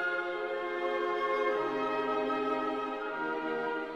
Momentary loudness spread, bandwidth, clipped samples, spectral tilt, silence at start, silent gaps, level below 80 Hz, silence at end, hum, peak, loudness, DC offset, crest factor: 4 LU; 9 kHz; under 0.1%; -5 dB/octave; 0 s; none; -72 dBFS; 0 s; none; -18 dBFS; -33 LUFS; under 0.1%; 14 dB